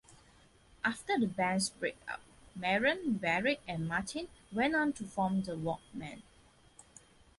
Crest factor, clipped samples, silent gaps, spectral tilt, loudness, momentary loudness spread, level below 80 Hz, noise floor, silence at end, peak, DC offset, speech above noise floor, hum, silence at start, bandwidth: 18 dB; under 0.1%; none; -4.5 dB/octave; -34 LUFS; 14 LU; -64 dBFS; -63 dBFS; 1.15 s; -18 dBFS; under 0.1%; 29 dB; none; 0.1 s; 11.5 kHz